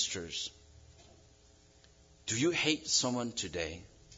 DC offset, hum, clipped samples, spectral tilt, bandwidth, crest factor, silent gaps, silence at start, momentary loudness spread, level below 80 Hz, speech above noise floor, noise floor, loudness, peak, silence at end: under 0.1%; none; under 0.1%; -2.5 dB/octave; 7.8 kHz; 22 dB; none; 0 s; 13 LU; -64 dBFS; 28 dB; -62 dBFS; -33 LUFS; -14 dBFS; 0 s